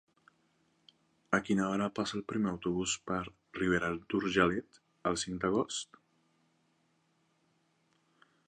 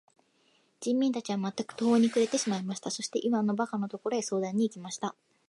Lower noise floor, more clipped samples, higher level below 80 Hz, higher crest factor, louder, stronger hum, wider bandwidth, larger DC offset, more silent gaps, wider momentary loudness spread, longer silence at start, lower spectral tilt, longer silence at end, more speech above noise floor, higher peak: first, -74 dBFS vs -68 dBFS; neither; first, -62 dBFS vs -80 dBFS; first, 24 dB vs 16 dB; second, -33 LUFS vs -30 LUFS; neither; about the same, 11 kHz vs 11.5 kHz; neither; neither; about the same, 8 LU vs 10 LU; first, 1.3 s vs 0.8 s; about the same, -4.5 dB/octave vs -5 dB/octave; first, 2.65 s vs 0.35 s; about the same, 41 dB vs 39 dB; about the same, -12 dBFS vs -14 dBFS